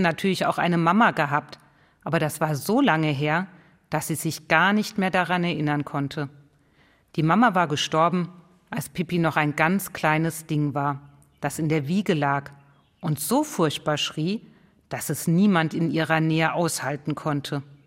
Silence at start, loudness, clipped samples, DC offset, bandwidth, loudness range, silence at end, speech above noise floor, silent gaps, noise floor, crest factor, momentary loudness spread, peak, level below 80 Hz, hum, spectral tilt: 0 s; -24 LUFS; under 0.1%; under 0.1%; 16 kHz; 3 LU; 0.1 s; 37 dB; none; -60 dBFS; 22 dB; 12 LU; -2 dBFS; -64 dBFS; none; -5 dB/octave